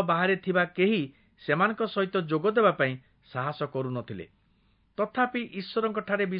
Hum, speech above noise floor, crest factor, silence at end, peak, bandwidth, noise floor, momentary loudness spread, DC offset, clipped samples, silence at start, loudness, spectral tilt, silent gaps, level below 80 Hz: none; 39 dB; 18 dB; 0 s; -10 dBFS; 5.2 kHz; -66 dBFS; 15 LU; under 0.1%; under 0.1%; 0 s; -27 LUFS; -10.5 dB/octave; none; -70 dBFS